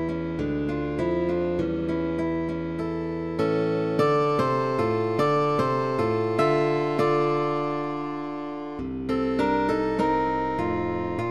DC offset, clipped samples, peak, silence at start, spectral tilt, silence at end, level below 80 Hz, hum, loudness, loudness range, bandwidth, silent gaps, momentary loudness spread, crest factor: 0.3%; under 0.1%; -10 dBFS; 0 s; -7.5 dB/octave; 0 s; -48 dBFS; none; -25 LUFS; 3 LU; 12 kHz; none; 7 LU; 14 dB